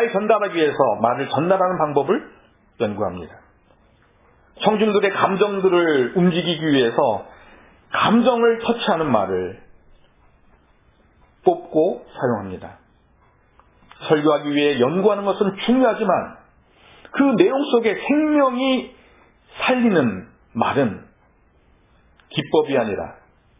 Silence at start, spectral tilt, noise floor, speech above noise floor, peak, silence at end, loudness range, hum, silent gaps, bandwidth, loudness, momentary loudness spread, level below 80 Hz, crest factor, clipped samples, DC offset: 0 s; -10 dB/octave; -57 dBFS; 38 dB; 0 dBFS; 0.45 s; 6 LU; none; none; 3.9 kHz; -19 LUFS; 11 LU; -56 dBFS; 20 dB; under 0.1%; under 0.1%